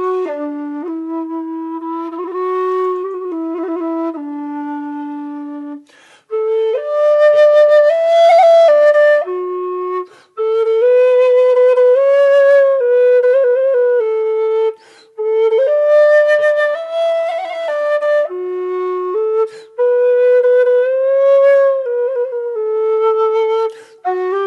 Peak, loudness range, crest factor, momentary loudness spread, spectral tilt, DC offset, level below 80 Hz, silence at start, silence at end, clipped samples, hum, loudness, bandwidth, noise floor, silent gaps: -2 dBFS; 10 LU; 12 dB; 14 LU; -3 dB/octave; under 0.1%; -84 dBFS; 0 s; 0 s; under 0.1%; none; -13 LUFS; 7.8 kHz; -46 dBFS; none